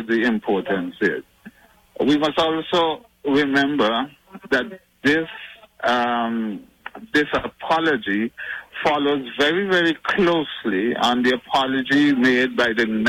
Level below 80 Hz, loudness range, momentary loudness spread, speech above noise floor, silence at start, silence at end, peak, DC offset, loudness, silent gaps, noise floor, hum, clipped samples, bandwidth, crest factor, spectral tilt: -56 dBFS; 4 LU; 11 LU; 27 dB; 0 s; 0 s; -10 dBFS; under 0.1%; -20 LUFS; none; -47 dBFS; none; under 0.1%; 15.5 kHz; 12 dB; -5 dB/octave